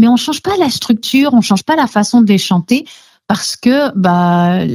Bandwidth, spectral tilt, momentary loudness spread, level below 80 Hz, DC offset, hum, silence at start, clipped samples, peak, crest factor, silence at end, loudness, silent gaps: 14 kHz; -5 dB/octave; 6 LU; -54 dBFS; under 0.1%; none; 0 s; under 0.1%; 0 dBFS; 12 dB; 0 s; -12 LUFS; none